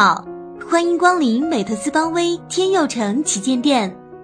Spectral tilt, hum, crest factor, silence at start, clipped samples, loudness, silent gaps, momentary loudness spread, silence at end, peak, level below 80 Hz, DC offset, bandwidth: -3.5 dB/octave; none; 16 dB; 0 s; under 0.1%; -18 LUFS; none; 7 LU; 0 s; -2 dBFS; -58 dBFS; under 0.1%; 10 kHz